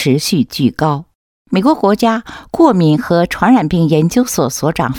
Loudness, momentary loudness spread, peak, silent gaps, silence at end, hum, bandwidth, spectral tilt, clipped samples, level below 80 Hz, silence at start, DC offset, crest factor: -13 LUFS; 6 LU; 0 dBFS; 1.15-1.45 s; 0 s; none; 18.5 kHz; -6 dB/octave; under 0.1%; -42 dBFS; 0 s; under 0.1%; 12 dB